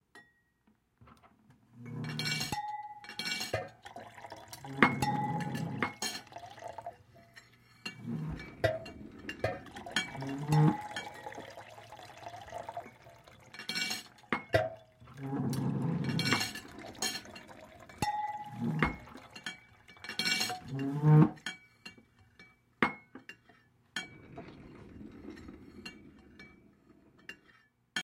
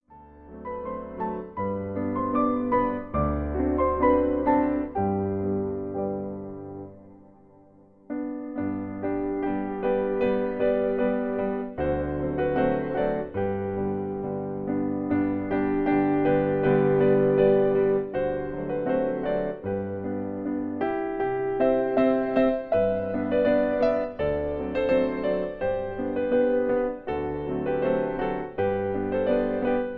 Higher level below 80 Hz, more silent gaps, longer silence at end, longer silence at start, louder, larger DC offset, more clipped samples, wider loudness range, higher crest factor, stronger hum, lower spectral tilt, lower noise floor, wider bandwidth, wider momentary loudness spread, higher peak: second, -62 dBFS vs -44 dBFS; neither; about the same, 0 s vs 0 s; about the same, 0.15 s vs 0.1 s; second, -34 LUFS vs -26 LUFS; neither; neither; first, 10 LU vs 7 LU; first, 34 dB vs 18 dB; neither; second, -5 dB/octave vs -10.5 dB/octave; first, -72 dBFS vs -54 dBFS; first, 16.5 kHz vs 5 kHz; first, 22 LU vs 9 LU; first, -4 dBFS vs -8 dBFS